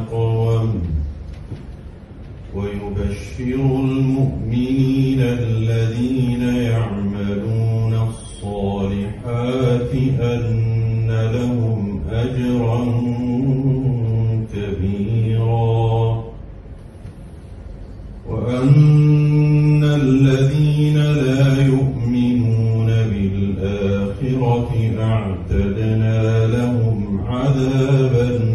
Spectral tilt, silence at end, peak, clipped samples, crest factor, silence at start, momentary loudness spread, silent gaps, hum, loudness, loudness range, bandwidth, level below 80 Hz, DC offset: -8.5 dB/octave; 0 s; -2 dBFS; under 0.1%; 16 dB; 0 s; 18 LU; none; none; -18 LUFS; 7 LU; 10 kHz; -34 dBFS; under 0.1%